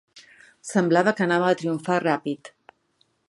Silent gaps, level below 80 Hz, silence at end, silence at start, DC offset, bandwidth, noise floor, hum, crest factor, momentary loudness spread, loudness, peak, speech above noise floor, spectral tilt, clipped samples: none; -72 dBFS; 0.85 s; 0.15 s; under 0.1%; 11.5 kHz; -68 dBFS; none; 20 dB; 12 LU; -23 LUFS; -4 dBFS; 45 dB; -6 dB/octave; under 0.1%